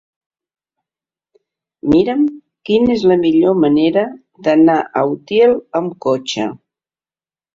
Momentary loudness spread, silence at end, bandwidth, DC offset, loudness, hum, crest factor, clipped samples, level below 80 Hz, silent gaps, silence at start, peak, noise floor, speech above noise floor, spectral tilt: 10 LU; 1 s; 7.6 kHz; under 0.1%; -15 LUFS; none; 14 dB; under 0.1%; -52 dBFS; none; 1.85 s; -2 dBFS; under -90 dBFS; over 77 dB; -6.5 dB/octave